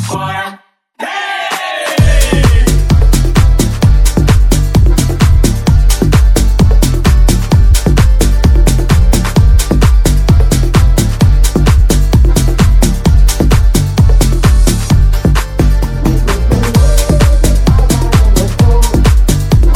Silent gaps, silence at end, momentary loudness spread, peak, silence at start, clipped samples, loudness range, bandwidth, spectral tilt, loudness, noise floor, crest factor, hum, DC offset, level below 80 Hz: none; 0 s; 3 LU; 0 dBFS; 0 s; 0.2%; 1 LU; 16.5 kHz; -5.5 dB/octave; -10 LUFS; -37 dBFS; 8 dB; none; under 0.1%; -10 dBFS